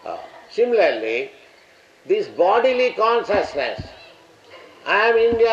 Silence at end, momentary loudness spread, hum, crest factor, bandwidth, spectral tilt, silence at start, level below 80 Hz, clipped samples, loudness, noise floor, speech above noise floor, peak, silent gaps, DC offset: 0 s; 17 LU; none; 14 dB; 7.6 kHz; -4.5 dB/octave; 0.05 s; -54 dBFS; under 0.1%; -19 LUFS; -51 dBFS; 33 dB; -6 dBFS; none; under 0.1%